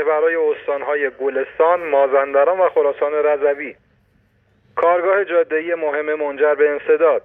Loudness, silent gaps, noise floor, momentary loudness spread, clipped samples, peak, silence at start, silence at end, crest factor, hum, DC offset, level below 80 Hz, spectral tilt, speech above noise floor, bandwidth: -17 LUFS; none; -59 dBFS; 7 LU; under 0.1%; -4 dBFS; 0 s; 0.05 s; 14 dB; none; under 0.1%; -64 dBFS; -7 dB/octave; 42 dB; 3.8 kHz